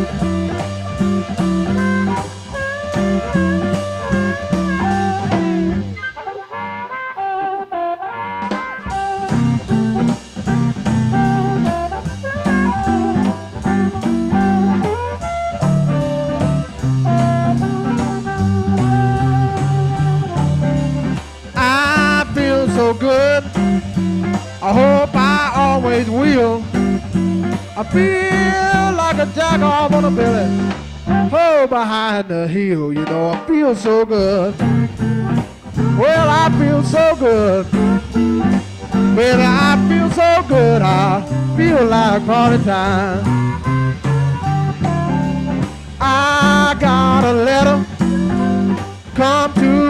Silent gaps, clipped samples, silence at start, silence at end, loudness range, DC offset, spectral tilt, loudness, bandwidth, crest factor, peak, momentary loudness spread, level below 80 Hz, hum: none; under 0.1%; 0 s; 0 s; 5 LU; under 0.1%; -6.5 dB/octave; -16 LUFS; 11.5 kHz; 14 dB; -2 dBFS; 10 LU; -36 dBFS; none